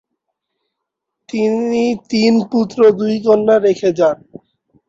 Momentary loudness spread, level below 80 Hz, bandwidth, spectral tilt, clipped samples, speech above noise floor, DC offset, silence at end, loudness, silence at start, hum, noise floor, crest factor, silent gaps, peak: 6 LU; -60 dBFS; 7.8 kHz; -6 dB/octave; under 0.1%; 64 dB; under 0.1%; 0.75 s; -14 LUFS; 1.35 s; none; -78 dBFS; 14 dB; none; -2 dBFS